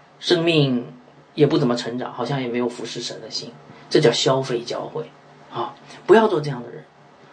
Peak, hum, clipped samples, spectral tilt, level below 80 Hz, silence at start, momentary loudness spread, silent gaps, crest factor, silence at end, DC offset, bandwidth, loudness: -2 dBFS; none; under 0.1%; -5.5 dB/octave; -68 dBFS; 0.2 s; 18 LU; none; 20 dB; 0.5 s; under 0.1%; 9.8 kHz; -21 LUFS